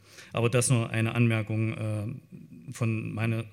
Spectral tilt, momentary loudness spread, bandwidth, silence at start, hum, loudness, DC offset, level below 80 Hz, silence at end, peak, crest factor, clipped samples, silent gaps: -5.5 dB/octave; 18 LU; 14 kHz; 0.15 s; none; -28 LUFS; under 0.1%; -66 dBFS; 0 s; -10 dBFS; 18 dB; under 0.1%; none